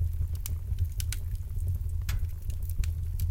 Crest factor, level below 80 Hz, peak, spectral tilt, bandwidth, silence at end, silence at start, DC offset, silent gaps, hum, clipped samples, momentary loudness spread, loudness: 16 dB; -32 dBFS; -14 dBFS; -4.5 dB/octave; 17 kHz; 0 s; 0 s; under 0.1%; none; none; under 0.1%; 4 LU; -34 LUFS